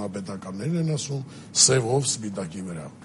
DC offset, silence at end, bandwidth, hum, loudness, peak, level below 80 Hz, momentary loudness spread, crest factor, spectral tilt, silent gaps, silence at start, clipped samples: under 0.1%; 0 s; 11.5 kHz; none; -23 LUFS; -4 dBFS; -62 dBFS; 17 LU; 22 dB; -3.5 dB/octave; none; 0 s; under 0.1%